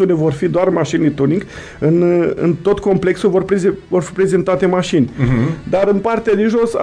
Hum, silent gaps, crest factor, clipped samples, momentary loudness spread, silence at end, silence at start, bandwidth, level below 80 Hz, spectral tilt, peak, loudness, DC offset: none; none; 14 dB; under 0.1%; 3 LU; 0 s; 0 s; 10.5 kHz; -40 dBFS; -7.5 dB/octave; 0 dBFS; -15 LUFS; under 0.1%